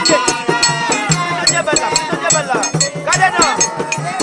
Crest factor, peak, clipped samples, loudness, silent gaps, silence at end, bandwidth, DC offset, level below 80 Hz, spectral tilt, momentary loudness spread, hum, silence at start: 14 dB; 0 dBFS; under 0.1%; -14 LUFS; none; 0 s; 10.5 kHz; under 0.1%; -46 dBFS; -2 dB/octave; 4 LU; none; 0 s